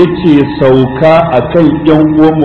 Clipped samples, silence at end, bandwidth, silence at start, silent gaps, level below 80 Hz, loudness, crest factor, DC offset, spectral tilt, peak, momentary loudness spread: 5%; 0 s; 5.2 kHz; 0 s; none; -32 dBFS; -7 LUFS; 6 dB; under 0.1%; -9 dB/octave; 0 dBFS; 2 LU